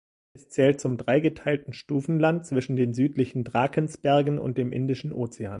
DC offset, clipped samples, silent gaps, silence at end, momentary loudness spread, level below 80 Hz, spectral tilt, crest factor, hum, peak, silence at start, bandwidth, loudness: under 0.1%; under 0.1%; none; 0 s; 8 LU; -60 dBFS; -7 dB/octave; 18 dB; none; -8 dBFS; 0.35 s; 11 kHz; -26 LUFS